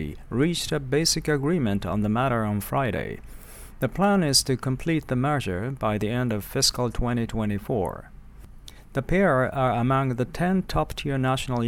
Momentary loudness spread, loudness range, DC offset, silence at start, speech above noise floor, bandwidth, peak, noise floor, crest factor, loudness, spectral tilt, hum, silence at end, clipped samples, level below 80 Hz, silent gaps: 9 LU; 2 LU; under 0.1%; 0 s; 20 dB; 17.5 kHz; -6 dBFS; -44 dBFS; 18 dB; -25 LUFS; -5 dB/octave; none; 0 s; under 0.1%; -40 dBFS; none